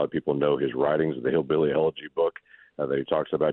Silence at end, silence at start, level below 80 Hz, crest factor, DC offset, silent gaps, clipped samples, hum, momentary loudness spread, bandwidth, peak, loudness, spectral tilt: 0 s; 0 s; -60 dBFS; 16 dB; under 0.1%; none; under 0.1%; none; 5 LU; 4.1 kHz; -10 dBFS; -26 LUFS; -10.5 dB/octave